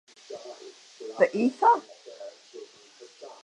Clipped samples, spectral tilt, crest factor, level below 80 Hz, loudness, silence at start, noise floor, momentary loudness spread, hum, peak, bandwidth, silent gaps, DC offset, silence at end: under 0.1%; -5 dB/octave; 22 dB; -88 dBFS; -24 LUFS; 0.3 s; -52 dBFS; 24 LU; none; -8 dBFS; 10.5 kHz; none; under 0.1%; 0.15 s